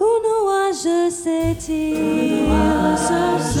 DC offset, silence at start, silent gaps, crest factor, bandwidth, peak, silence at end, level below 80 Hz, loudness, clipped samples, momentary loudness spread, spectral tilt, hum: under 0.1%; 0 s; none; 14 dB; 17 kHz; -4 dBFS; 0 s; -34 dBFS; -19 LUFS; under 0.1%; 4 LU; -5.5 dB/octave; none